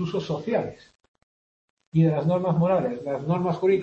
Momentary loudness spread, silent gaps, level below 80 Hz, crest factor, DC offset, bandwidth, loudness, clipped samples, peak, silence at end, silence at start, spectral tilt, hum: 7 LU; 1.08-1.14 s, 1.23-1.77 s, 1.87-1.92 s; -60 dBFS; 16 dB; under 0.1%; 6.8 kHz; -24 LUFS; under 0.1%; -10 dBFS; 0 s; 0 s; -9 dB/octave; none